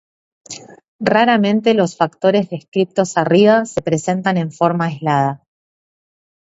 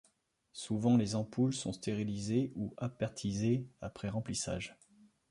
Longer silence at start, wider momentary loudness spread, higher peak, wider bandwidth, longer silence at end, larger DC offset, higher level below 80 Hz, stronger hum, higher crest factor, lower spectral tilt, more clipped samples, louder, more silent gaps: about the same, 0.5 s vs 0.55 s; about the same, 10 LU vs 12 LU; first, 0 dBFS vs -18 dBFS; second, 8 kHz vs 11.5 kHz; first, 1.15 s vs 0.6 s; neither; about the same, -58 dBFS vs -62 dBFS; neither; about the same, 16 dB vs 18 dB; about the same, -6 dB/octave vs -6 dB/octave; neither; first, -16 LUFS vs -35 LUFS; first, 0.88-0.99 s, 2.68-2.72 s vs none